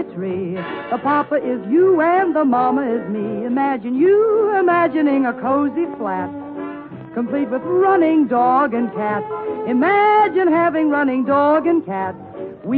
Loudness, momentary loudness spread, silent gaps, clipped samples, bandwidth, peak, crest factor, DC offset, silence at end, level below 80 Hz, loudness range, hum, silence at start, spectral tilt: -17 LUFS; 11 LU; none; under 0.1%; 4.7 kHz; -6 dBFS; 12 dB; under 0.1%; 0 s; -62 dBFS; 3 LU; none; 0 s; -10 dB/octave